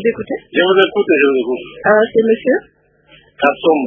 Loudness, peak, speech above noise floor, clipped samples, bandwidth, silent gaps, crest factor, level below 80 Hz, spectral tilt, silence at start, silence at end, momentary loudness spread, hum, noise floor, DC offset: -14 LUFS; 0 dBFS; 35 dB; under 0.1%; 3.8 kHz; none; 14 dB; -56 dBFS; -7.5 dB/octave; 0 s; 0 s; 7 LU; none; -49 dBFS; under 0.1%